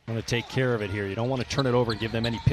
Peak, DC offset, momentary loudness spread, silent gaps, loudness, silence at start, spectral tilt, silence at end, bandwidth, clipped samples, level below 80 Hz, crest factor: -8 dBFS; under 0.1%; 4 LU; none; -27 LUFS; 0.05 s; -6 dB/octave; 0 s; 13 kHz; under 0.1%; -46 dBFS; 18 dB